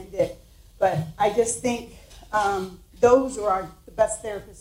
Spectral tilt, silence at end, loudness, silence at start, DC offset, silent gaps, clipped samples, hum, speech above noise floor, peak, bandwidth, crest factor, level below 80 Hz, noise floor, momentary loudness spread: -4.5 dB/octave; 0 s; -24 LUFS; 0 s; under 0.1%; none; under 0.1%; none; 24 dB; -6 dBFS; 16 kHz; 18 dB; -48 dBFS; -47 dBFS; 14 LU